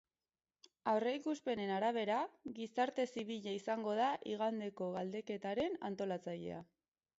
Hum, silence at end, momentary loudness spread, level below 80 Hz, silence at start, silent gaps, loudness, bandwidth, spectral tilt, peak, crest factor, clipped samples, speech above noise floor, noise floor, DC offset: none; 0.55 s; 8 LU; -78 dBFS; 0.85 s; none; -40 LUFS; 7.6 kHz; -4 dB/octave; -22 dBFS; 18 dB; under 0.1%; over 51 dB; under -90 dBFS; under 0.1%